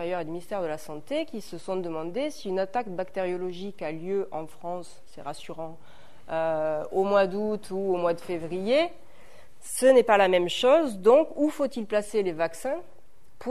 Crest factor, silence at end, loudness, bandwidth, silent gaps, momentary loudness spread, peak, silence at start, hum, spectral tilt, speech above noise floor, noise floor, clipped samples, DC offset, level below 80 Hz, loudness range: 20 dB; 0 s; -26 LUFS; 13.5 kHz; none; 17 LU; -6 dBFS; 0 s; none; -4.5 dB/octave; 28 dB; -55 dBFS; under 0.1%; 1%; -62 dBFS; 10 LU